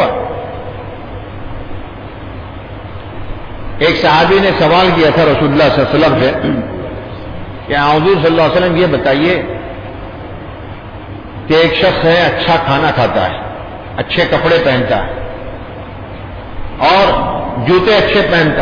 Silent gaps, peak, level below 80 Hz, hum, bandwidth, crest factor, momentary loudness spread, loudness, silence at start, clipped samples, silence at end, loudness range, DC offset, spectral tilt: none; -2 dBFS; -32 dBFS; none; 5.2 kHz; 12 dB; 18 LU; -11 LUFS; 0 s; under 0.1%; 0 s; 6 LU; under 0.1%; -7 dB/octave